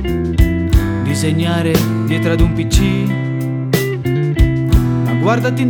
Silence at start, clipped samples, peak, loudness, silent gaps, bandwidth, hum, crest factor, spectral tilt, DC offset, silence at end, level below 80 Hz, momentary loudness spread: 0 s; under 0.1%; 0 dBFS; -15 LUFS; none; over 20 kHz; none; 14 dB; -6.5 dB/octave; under 0.1%; 0 s; -20 dBFS; 4 LU